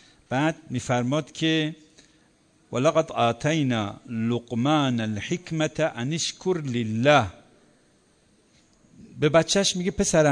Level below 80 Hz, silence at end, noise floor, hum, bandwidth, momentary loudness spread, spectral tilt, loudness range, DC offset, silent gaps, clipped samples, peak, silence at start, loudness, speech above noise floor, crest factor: -54 dBFS; 0 s; -61 dBFS; none; 10 kHz; 10 LU; -4.5 dB/octave; 2 LU; under 0.1%; none; under 0.1%; -6 dBFS; 0.3 s; -24 LUFS; 38 dB; 20 dB